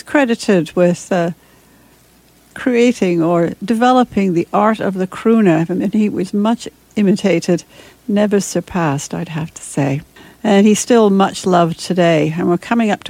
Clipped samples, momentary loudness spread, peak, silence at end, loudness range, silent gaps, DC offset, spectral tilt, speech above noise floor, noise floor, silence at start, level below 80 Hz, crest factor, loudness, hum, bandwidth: under 0.1%; 10 LU; 0 dBFS; 0 s; 3 LU; none; under 0.1%; -6 dB/octave; 35 dB; -49 dBFS; 0.05 s; -52 dBFS; 14 dB; -15 LUFS; none; 16 kHz